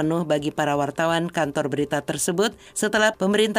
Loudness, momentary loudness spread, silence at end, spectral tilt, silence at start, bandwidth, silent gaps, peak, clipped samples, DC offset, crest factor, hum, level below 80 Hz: -23 LUFS; 5 LU; 0 s; -4 dB/octave; 0 s; 16 kHz; none; -8 dBFS; under 0.1%; under 0.1%; 16 dB; none; -56 dBFS